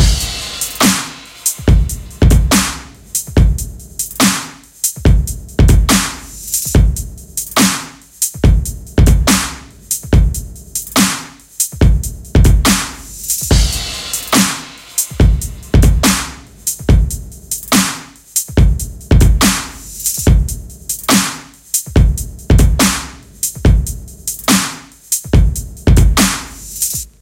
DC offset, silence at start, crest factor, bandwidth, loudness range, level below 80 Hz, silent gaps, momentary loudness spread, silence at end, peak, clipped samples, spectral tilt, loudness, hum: under 0.1%; 0 s; 14 dB; 17 kHz; 1 LU; -16 dBFS; none; 12 LU; 0.15 s; 0 dBFS; under 0.1%; -4 dB/octave; -14 LUFS; none